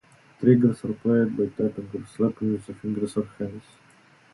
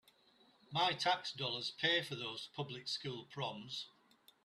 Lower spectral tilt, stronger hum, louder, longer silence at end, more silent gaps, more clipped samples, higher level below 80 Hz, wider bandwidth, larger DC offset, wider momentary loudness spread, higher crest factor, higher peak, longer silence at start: first, -9 dB/octave vs -3.5 dB/octave; neither; first, -25 LUFS vs -39 LUFS; first, 0.75 s vs 0.55 s; neither; neither; first, -60 dBFS vs -82 dBFS; second, 11.5 kHz vs 13.5 kHz; neither; first, 15 LU vs 12 LU; about the same, 20 dB vs 20 dB; first, -4 dBFS vs -20 dBFS; second, 0.4 s vs 0.7 s